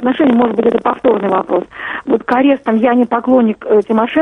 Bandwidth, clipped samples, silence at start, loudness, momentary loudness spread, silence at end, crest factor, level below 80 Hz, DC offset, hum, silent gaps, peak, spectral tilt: 4.4 kHz; under 0.1%; 0 s; -13 LUFS; 5 LU; 0 s; 12 dB; -52 dBFS; under 0.1%; none; none; 0 dBFS; -8 dB/octave